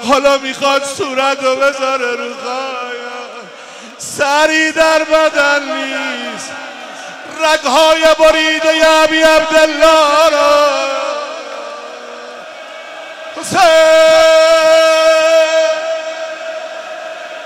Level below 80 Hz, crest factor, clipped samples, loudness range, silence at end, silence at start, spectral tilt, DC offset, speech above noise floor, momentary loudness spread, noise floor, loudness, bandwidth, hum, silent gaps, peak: -46 dBFS; 12 dB; under 0.1%; 7 LU; 0 s; 0 s; -1.5 dB/octave; under 0.1%; 22 dB; 20 LU; -32 dBFS; -11 LUFS; 15.5 kHz; none; none; 0 dBFS